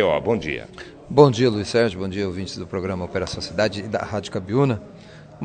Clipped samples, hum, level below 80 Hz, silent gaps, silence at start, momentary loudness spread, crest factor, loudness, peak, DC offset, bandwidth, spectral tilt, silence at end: under 0.1%; none; -52 dBFS; none; 0 s; 14 LU; 22 dB; -22 LUFS; 0 dBFS; under 0.1%; 9.4 kHz; -6 dB/octave; 0 s